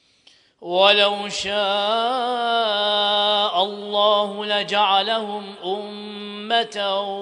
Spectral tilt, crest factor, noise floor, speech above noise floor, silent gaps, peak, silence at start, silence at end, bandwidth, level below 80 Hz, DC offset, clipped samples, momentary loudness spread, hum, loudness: -2.5 dB/octave; 20 dB; -56 dBFS; 35 dB; none; -2 dBFS; 0.6 s; 0 s; 10.5 kHz; -66 dBFS; under 0.1%; under 0.1%; 12 LU; none; -20 LUFS